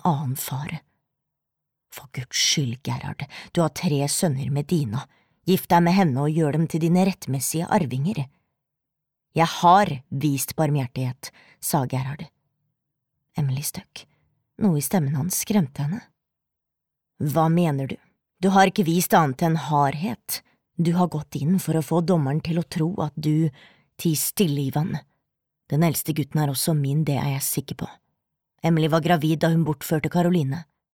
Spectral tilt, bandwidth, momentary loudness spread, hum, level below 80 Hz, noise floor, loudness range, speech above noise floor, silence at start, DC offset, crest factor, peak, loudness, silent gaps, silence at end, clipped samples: -5.5 dB/octave; 18 kHz; 14 LU; none; -58 dBFS; -84 dBFS; 5 LU; 61 dB; 0.05 s; under 0.1%; 18 dB; -4 dBFS; -23 LUFS; none; 0.35 s; under 0.1%